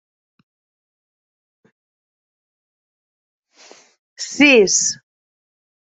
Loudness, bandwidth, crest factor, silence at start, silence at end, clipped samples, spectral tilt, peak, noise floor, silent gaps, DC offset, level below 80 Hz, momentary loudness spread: -13 LUFS; 8.2 kHz; 20 dB; 4.2 s; 0.95 s; under 0.1%; -1.5 dB/octave; -2 dBFS; -48 dBFS; none; under 0.1%; -68 dBFS; 20 LU